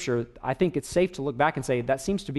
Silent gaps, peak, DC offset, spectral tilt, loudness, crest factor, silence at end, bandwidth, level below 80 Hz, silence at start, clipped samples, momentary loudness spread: none; -8 dBFS; under 0.1%; -5.5 dB/octave; -27 LUFS; 18 dB; 0 s; 12 kHz; -50 dBFS; 0 s; under 0.1%; 4 LU